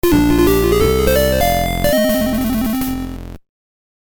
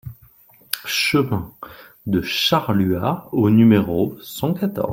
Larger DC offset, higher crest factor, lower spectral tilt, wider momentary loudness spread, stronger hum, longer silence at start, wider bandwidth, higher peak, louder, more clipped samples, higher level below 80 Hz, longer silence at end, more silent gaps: neither; second, 14 dB vs 20 dB; about the same, -5.5 dB/octave vs -5.5 dB/octave; second, 9 LU vs 19 LU; neither; about the same, 0.05 s vs 0.05 s; first, over 20 kHz vs 16.5 kHz; about the same, 0 dBFS vs 0 dBFS; first, -15 LUFS vs -19 LUFS; neither; first, -26 dBFS vs -52 dBFS; first, 0.7 s vs 0 s; neither